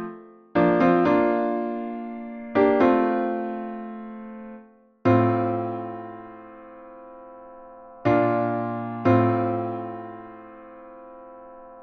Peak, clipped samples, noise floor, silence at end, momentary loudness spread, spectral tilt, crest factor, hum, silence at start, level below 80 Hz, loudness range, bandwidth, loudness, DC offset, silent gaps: -6 dBFS; under 0.1%; -50 dBFS; 0 s; 25 LU; -9.5 dB/octave; 18 dB; none; 0 s; -60 dBFS; 6 LU; 6.2 kHz; -23 LUFS; under 0.1%; none